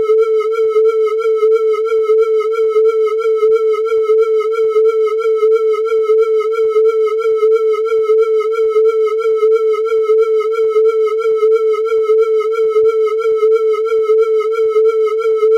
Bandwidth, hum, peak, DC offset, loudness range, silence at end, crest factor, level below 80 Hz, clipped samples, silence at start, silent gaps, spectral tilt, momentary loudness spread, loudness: 6.8 kHz; none; -4 dBFS; under 0.1%; 0 LU; 0 s; 8 dB; -68 dBFS; under 0.1%; 0 s; none; -2.5 dB/octave; 2 LU; -13 LUFS